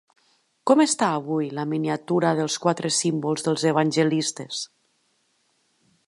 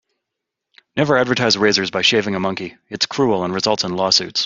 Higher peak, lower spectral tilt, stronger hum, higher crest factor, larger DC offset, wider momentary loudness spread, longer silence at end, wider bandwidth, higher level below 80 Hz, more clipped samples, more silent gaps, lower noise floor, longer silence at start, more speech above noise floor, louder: about the same, -4 dBFS vs -2 dBFS; about the same, -4.5 dB/octave vs -3.5 dB/octave; neither; about the same, 20 dB vs 18 dB; neither; first, 11 LU vs 8 LU; first, 1.4 s vs 0 s; first, 11.5 kHz vs 7.8 kHz; second, -74 dBFS vs -58 dBFS; neither; neither; second, -68 dBFS vs -81 dBFS; second, 0.65 s vs 0.95 s; second, 46 dB vs 63 dB; second, -23 LUFS vs -17 LUFS